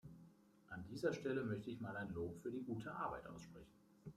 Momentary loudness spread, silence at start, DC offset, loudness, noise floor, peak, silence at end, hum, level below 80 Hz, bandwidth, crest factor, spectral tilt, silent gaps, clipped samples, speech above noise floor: 18 LU; 0.05 s; under 0.1%; -47 LUFS; -67 dBFS; -28 dBFS; 0.05 s; none; -72 dBFS; 15 kHz; 20 dB; -7 dB/octave; none; under 0.1%; 21 dB